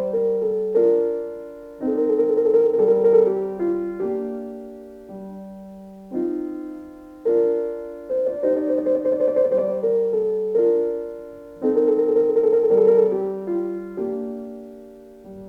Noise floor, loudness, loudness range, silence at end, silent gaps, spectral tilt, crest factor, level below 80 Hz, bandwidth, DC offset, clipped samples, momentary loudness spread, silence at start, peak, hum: -42 dBFS; -21 LUFS; 8 LU; 0 s; none; -9.5 dB/octave; 16 dB; -60 dBFS; 2.9 kHz; under 0.1%; under 0.1%; 21 LU; 0 s; -6 dBFS; none